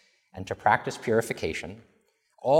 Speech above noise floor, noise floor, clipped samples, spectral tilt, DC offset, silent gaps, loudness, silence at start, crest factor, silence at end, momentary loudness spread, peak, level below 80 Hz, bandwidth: 37 dB; -65 dBFS; under 0.1%; -5 dB/octave; under 0.1%; none; -28 LUFS; 0.35 s; 22 dB; 0 s; 18 LU; -6 dBFS; -58 dBFS; 16.5 kHz